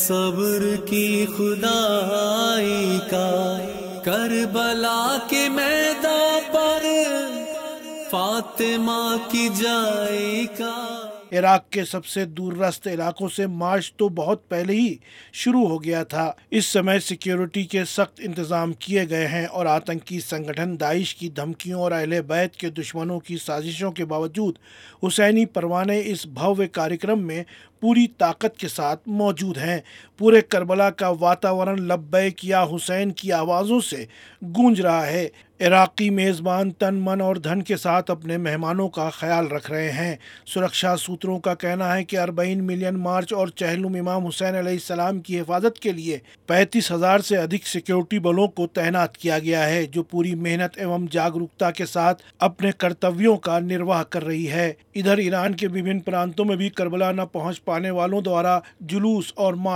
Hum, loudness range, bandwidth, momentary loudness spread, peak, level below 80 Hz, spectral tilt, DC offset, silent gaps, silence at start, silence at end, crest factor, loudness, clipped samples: none; 4 LU; 17 kHz; 9 LU; -2 dBFS; -66 dBFS; -4.5 dB/octave; under 0.1%; none; 0 s; 0 s; 20 dB; -22 LUFS; under 0.1%